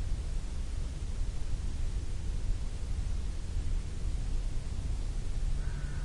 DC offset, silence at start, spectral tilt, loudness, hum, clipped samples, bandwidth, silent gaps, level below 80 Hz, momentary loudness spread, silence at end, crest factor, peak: under 0.1%; 0 s; -5.5 dB/octave; -39 LUFS; none; under 0.1%; 11 kHz; none; -34 dBFS; 2 LU; 0 s; 12 dB; -20 dBFS